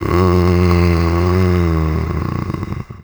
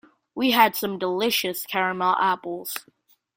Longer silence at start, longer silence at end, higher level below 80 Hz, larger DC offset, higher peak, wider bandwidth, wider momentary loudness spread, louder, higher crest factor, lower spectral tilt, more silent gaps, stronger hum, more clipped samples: second, 0 s vs 0.35 s; second, 0 s vs 0.55 s; first, -26 dBFS vs -68 dBFS; neither; about the same, 0 dBFS vs -2 dBFS; first, over 20 kHz vs 16.5 kHz; second, 10 LU vs 13 LU; first, -15 LUFS vs -23 LUFS; second, 14 dB vs 22 dB; first, -8 dB/octave vs -3 dB/octave; neither; neither; neither